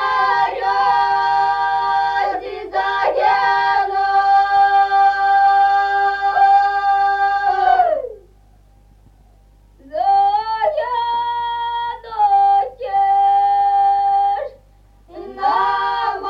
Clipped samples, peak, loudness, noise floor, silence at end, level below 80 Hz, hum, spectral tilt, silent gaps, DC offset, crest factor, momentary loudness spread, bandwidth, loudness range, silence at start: under 0.1%; -4 dBFS; -16 LUFS; -49 dBFS; 0 s; -50 dBFS; 50 Hz at -50 dBFS; -3.5 dB/octave; none; under 0.1%; 12 dB; 9 LU; 6.6 kHz; 6 LU; 0 s